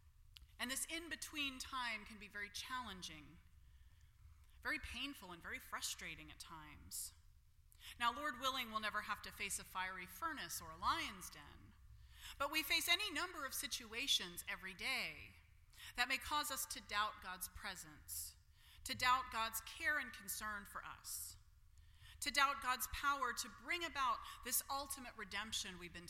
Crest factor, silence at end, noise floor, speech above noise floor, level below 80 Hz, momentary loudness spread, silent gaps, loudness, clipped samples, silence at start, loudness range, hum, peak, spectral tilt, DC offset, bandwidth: 26 dB; 0 s; -67 dBFS; 23 dB; -66 dBFS; 15 LU; none; -42 LUFS; under 0.1%; 0.05 s; 8 LU; none; -20 dBFS; -1 dB/octave; under 0.1%; 16.5 kHz